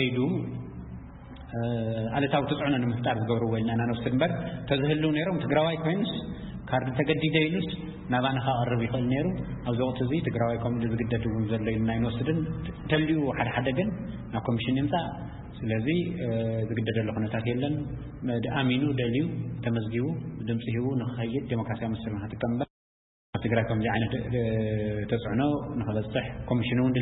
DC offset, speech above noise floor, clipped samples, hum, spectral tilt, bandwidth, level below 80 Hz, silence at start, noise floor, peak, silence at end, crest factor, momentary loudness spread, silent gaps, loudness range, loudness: under 0.1%; over 62 dB; under 0.1%; none; -11.5 dB/octave; 4.1 kHz; -48 dBFS; 0 s; under -90 dBFS; -10 dBFS; 0 s; 18 dB; 8 LU; 22.70-23.33 s; 3 LU; -29 LUFS